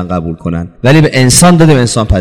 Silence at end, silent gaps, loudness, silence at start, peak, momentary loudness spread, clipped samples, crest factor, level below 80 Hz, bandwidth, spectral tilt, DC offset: 0 s; none; -7 LUFS; 0 s; 0 dBFS; 12 LU; 0.9%; 8 dB; -24 dBFS; over 20 kHz; -5 dB/octave; under 0.1%